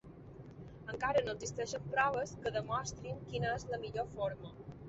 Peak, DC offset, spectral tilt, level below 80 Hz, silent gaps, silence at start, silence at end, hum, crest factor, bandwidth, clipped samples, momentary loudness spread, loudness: -18 dBFS; under 0.1%; -4 dB/octave; -60 dBFS; none; 0.05 s; 0 s; none; 20 dB; 8 kHz; under 0.1%; 18 LU; -38 LUFS